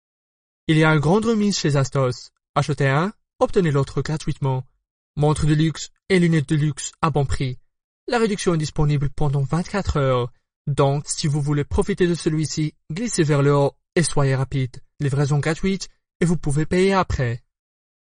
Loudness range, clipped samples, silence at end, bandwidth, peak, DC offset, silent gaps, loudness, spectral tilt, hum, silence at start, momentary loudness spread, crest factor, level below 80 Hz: 2 LU; under 0.1%; 0.75 s; 10 kHz; -4 dBFS; under 0.1%; 2.49-2.54 s, 4.91-5.14 s, 7.84-8.07 s, 10.56-10.65 s, 16.15-16.20 s; -21 LUFS; -6 dB/octave; none; 0.7 s; 9 LU; 16 dB; -36 dBFS